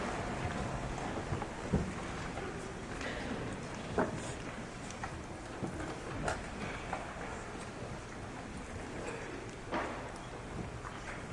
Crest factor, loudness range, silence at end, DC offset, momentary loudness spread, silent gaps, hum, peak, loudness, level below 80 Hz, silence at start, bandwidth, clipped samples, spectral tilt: 20 dB; 4 LU; 0 s; under 0.1%; 8 LU; none; none; -20 dBFS; -41 LUFS; -50 dBFS; 0 s; 11.5 kHz; under 0.1%; -5 dB/octave